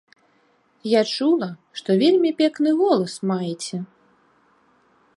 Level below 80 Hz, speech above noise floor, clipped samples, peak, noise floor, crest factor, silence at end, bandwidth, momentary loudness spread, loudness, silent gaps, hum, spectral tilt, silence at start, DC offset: -74 dBFS; 42 dB; under 0.1%; -6 dBFS; -62 dBFS; 18 dB; 1.3 s; 11.5 kHz; 14 LU; -21 LUFS; none; none; -5.5 dB/octave; 0.85 s; under 0.1%